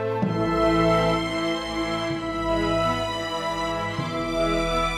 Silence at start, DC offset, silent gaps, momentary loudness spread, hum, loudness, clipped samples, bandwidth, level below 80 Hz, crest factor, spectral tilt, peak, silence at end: 0 s; under 0.1%; none; 7 LU; none; -24 LUFS; under 0.1%; 14 kHz; -38 dBFS; 14 dB; -5.5 dB/octave; -8 dBFS; 0 s